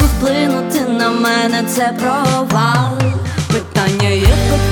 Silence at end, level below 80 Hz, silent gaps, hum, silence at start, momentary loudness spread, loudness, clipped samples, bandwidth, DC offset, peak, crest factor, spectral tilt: 0 s; -22 dBFS; none; none; 0 s; 4 LU; -14 LUFS; under 0.1%; over 20 kHz; under 0.1%; 0 dBFS; 14 dB; -5.5 dB/octave